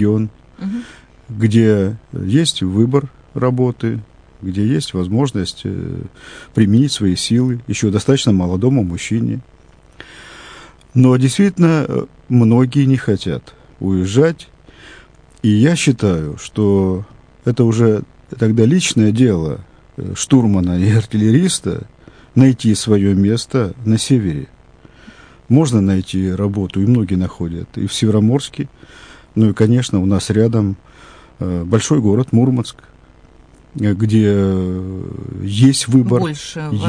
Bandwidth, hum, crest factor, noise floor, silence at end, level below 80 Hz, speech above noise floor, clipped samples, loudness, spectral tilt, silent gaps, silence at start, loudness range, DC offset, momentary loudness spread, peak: 10.5 kHz; none; 16 dB; -45 dBFS; 0 s; -44 dBFS; 30 dB; under 0.1%; -15 LUFS; -6.5 dB/octave; none; 0 s; 3 LU; under 0.1%; 14 LU; 0 dBFS